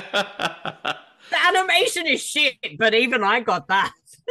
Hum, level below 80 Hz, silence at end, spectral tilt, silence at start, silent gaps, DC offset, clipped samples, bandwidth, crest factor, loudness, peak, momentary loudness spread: none; -68 dBFS; 0 s; -2 dB/octave; 0 s; none; under 0.1%; under 0.1%; 14 kHz; 16 dB; -20 LUFS; -4 dBFS; 12 LU